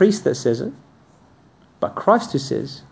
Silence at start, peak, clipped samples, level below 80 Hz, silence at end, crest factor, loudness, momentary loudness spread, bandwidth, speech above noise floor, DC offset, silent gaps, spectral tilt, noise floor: 0 s; -2 dBFS; under 0.1%; -58 dBFS; 0.1 s; 20 dB; -21 LUFS; 10 LU; 8 kHz; 33 dB; under 0.1%; none; -6 dB/octave; -53 dBFS